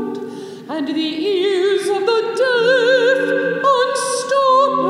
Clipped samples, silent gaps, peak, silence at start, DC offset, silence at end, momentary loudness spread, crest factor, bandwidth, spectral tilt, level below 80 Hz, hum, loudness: under 0.1%; none; -4 dBFS; 0 s; under 0.1%; 0 s; 12 LU; 12 dB; 13 kHz; -3 dB/octave; -76 dBFS; none; -16 LUFS